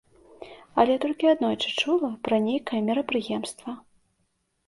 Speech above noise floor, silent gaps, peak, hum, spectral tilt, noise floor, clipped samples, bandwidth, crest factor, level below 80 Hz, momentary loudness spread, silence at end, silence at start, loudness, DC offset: 48 dB; none; -6 dBFS; none; -4.5 dB/octave; -73 dBFS; under 0.1%; 11.5 kHz; 20 dB; -66 dBFS; 16 LU; 0.9 s; 0.4 s; -25 LUFS; under 0.1%